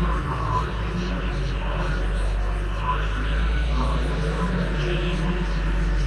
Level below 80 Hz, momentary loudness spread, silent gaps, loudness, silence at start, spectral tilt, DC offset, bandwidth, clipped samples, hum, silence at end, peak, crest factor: -24 dBFS; 3 LU; none; -26 LUFS; 0 s; -6.5 dB/octave; under 0.1%; 9.8 kHz; under 0.1%; none; 0 s; -12 dBFS; 12 dB